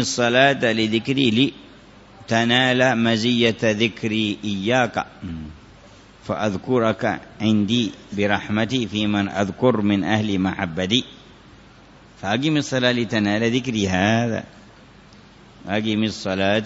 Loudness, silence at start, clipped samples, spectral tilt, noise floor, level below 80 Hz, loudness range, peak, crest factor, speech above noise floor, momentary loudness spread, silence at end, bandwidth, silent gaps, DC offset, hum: -20 LUFS; 0 s; under 0.1%; -5 dB/octave; -47 dBFS; -52 dBFS; 4 LU; -2 dBFS; 18 dB; 27 dB; 9 LU; 0 s; 8 kHz; none; under 0.1%; none